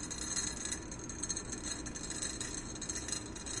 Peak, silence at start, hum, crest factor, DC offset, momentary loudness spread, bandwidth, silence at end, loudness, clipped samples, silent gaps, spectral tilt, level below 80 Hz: -20 dBFS; 0 s; none; 20 dB; under 0.1%; 5 LU; 11.5 kHz; 0 s; -38 LUFS; under 0.1%; none; -2 dB/octave; -52 dBFS